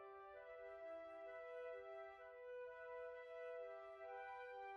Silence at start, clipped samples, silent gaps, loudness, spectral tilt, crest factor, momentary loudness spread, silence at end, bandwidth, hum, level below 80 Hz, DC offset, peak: 0 s; under 0.1%; none; -55 LUFS; -1 dB/octave; 12 dB; 5 LU; 0 s; 7.2 kHz; none; -86 dBFS; under 0.1%; -44 dBFS